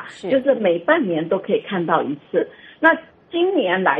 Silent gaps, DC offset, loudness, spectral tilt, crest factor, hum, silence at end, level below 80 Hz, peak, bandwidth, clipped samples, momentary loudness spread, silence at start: none; under 0.1%; -19 LUFS; -7 dB/octave; 20 dB; none; 0 s; -68 dBFS; 0 dBFS; 8.6 kHz; under 0.1%; 7 LU; 0 s